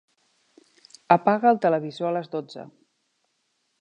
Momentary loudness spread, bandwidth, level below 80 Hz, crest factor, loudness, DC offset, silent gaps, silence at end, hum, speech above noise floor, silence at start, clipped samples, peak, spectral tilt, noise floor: 16 LU; 9 kHz; -78 dBFS; 24 dB; -23 LUFS; under 0.1%; none; 1.15 s; none; 50 dB; 1.1 s; under 0.1%; -2 dBFS; -7 dB/octave; -73 dBFS